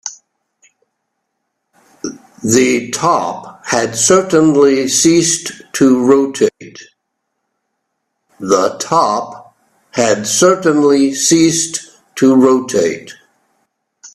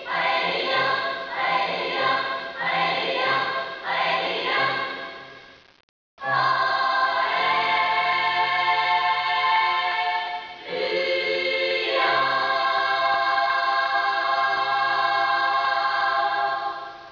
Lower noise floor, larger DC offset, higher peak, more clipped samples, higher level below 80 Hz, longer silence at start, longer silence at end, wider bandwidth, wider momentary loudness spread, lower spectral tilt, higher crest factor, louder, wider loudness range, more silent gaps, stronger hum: first, -72 dBFS vs -47 dBFS; neither; first, 0 dBFS vs -10 dBFS; neither; first, -56 dBFS vs -68 dBFS; about the same, 0.05 s vs 0 s; about the same, 0.1 s vs 0 s; first, 14.5 kHz vs 5.4 kHz; first, 16 LU vs 7 LU; about the same, -3.5 dB/octave vs -3.5 dB/octave; about the same, 14 dB vs 14 dB; first, -12 LUFS vs -22 LUFS; first, 6 LU vs 3 LU; second, none vs 5.83-6.17 s; neither